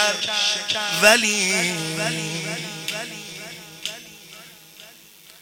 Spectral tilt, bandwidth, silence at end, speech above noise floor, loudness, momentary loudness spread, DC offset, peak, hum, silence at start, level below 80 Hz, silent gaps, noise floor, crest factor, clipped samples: -1.5 dB/octave; 17 kHz; 0.05 s; 26 dB; -20 LUFS; 23 LU; under 0.1%; 0 dBFS; none; 0 s; -66 dBFS; none; -48 dBFS; 24 dB; under 0.1%